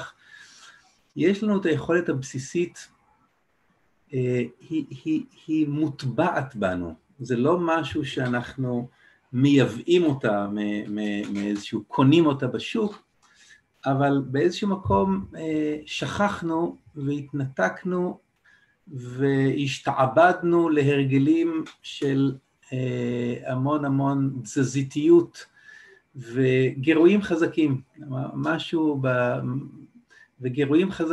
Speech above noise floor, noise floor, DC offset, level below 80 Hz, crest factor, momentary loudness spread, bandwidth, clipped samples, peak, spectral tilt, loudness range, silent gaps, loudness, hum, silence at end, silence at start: 44 dB; -68 dBFS; under 0.1%; -58 dBFS; 18 dB; 12 LU; 11.5 kHz; under 0.1%; -6 dBFS; -7 dB/octave; 5 LU; none; -24 LUFS; none; 0 s; 0 s